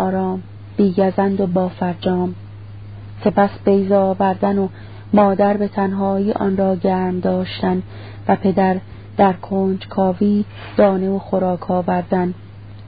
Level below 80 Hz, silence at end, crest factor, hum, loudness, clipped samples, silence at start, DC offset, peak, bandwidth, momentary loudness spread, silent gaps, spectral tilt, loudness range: -46 dBFS; 0 s; 16 dB; none; -18 LUFS; under 0.1%; 0 s; 0.5%; -2 dBFS; 5 kHz; 12 LU; none; -13 dB/octave; 2 LU